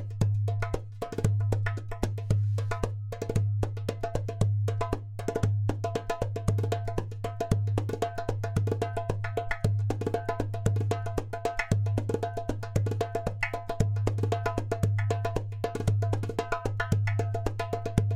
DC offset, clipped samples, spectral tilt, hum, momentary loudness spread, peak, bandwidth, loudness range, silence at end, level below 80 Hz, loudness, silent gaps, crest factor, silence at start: under 0.1%; under 0.1%; -7 dB/octave; none; 6 LU; -6 dBFS; 12.5 kHz; 1 LU; 0 s; -42 dBFS; -30 LUFS; none; 22 dB; 0 s